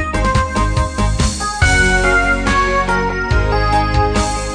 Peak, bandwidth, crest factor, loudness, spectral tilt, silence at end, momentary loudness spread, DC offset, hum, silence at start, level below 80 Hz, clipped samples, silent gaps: -2 dBFS; 10 kHz; 12 dB; -15 LUFS; -4.5 dB/octave; 0 s; 5 LU; 0.3%; none; 0 s; -20 dBFS; under 0.1%; none